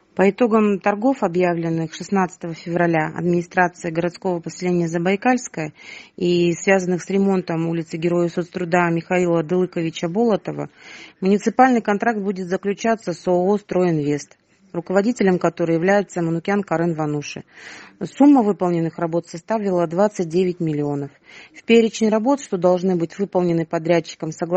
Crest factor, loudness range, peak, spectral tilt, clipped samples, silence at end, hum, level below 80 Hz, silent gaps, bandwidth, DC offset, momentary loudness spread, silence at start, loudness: 18 dB; 2 LU; 0 dBFS; -6.5 dB/octave; under 0.1%; 0 s; none; -62 dBFS; none; 8.4 kHz; under 0.1%; 12 LU; 0.15 s; -20 LUFS